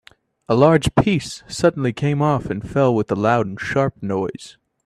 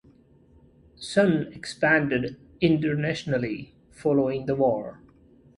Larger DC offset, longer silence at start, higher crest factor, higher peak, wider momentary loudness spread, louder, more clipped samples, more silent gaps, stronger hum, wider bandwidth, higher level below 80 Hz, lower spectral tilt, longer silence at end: neither; second, 0.5 s vs 1 s; about the same, 18 dB vs 18 dB; first, 0 dBFS vs -8 dBFS; second, 9 LU vs 13 LU; first, -19 LUFS vs -25 LUFS; neither; neither; neither; about the same, 12.5 kHz vs 11.5 kHz; first, -46 dBFS vs -56 dBFS; about the same, -6.5 dB/octave vs -6.5 dB/octave; second, 0.35 s vs 0.6 s